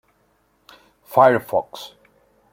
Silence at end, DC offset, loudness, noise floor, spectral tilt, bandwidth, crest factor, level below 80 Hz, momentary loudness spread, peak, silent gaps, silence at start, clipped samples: 0.65 s; under 0.1%; -18 LUFS; -63 dBFS; -6 dB/octave; 16.5 kHz; 20 dB; -64 dBFS; 22 LU; -2 dBFS; none; 1.1 s; under 0.1%